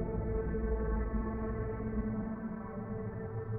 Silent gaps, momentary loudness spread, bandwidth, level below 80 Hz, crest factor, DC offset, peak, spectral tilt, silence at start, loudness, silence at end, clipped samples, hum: none; 6 LU; 2.6 kHz; -40 dBFS; 14 dB; under 0.1%; -22 dBFS; -13 dB/octave; 0 s; -37 LUFS; 0 s; under 0.1%; none